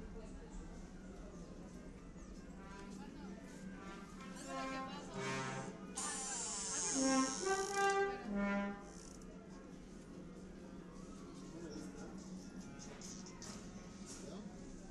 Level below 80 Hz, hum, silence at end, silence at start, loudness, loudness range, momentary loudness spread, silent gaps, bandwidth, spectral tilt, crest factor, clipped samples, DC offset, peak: -60 dBFS; none; 0 s; 0 s; -43 LUFS; 15 LU; 18 LU; none; 12.5 kHz; -3.5 dB/octave; 20 dB; under 0.1%; under 0.1%; -24 dBFS